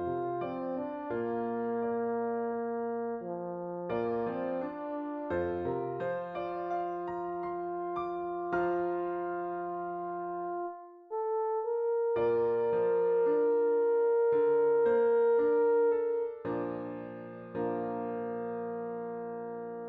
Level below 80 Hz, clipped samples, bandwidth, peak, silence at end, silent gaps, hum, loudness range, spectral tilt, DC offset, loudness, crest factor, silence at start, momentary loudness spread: -70 dBFS; under 0.1%; 4 kHz; -18 dBFS; 0 s; none; none; 8 LU; -9.5 dB/octave; under 0.1%; -32 LUFS; 14 dB; 0 s; 11 LU